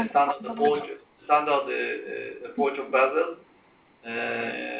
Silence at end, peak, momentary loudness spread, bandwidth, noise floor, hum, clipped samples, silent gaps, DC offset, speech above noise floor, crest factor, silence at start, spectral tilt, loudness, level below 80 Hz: 0 s; -8 dBFS; 13 LU; 4 kHz; -59 dBFS; none; under 0.1%; none; under 0.1%; 33 dB; 18 dB; 0 s; -8 dB/octave; -26 LUFS; -74 dBFS